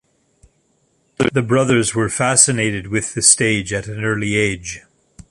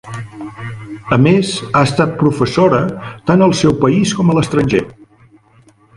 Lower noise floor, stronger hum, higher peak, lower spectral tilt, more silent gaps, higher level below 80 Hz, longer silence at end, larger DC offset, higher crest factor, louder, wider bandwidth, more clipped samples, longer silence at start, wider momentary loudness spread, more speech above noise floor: first, -62 dBFS vs -48 dBFS; neither; about the same, 0 dBFS vs 0 dBFS; second, -3.5 dB/octave vs -6 dB/octave; neither; about the same, -46 dBFS vs -42 dBFS; second, 0.5 s vs 1.05 s; neither; about the same, 18 dB vs 14 dB; second, -16 LUFS vs -13 LUFS; first, 13 kHz vs 11.5 kHz; neither; first, 1.2 s vs 0.05 s; second, 11 LU vs 17 LU; first, 45 dB vs 35 dB